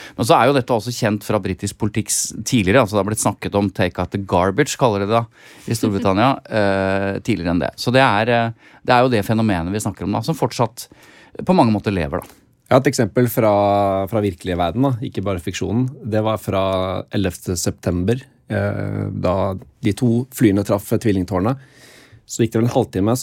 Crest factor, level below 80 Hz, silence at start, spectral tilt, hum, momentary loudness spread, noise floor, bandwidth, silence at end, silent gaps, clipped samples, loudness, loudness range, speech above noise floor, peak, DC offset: 18 dB; -50 dBFS; 0 s; -5.5 dB/octave; none; 9 LU; -46 dBFS; 17 kHz; 0 s; none; under 0.1%; -19 LUFS; 4 LU; 27 dB; -2 dBFS; under 0.1%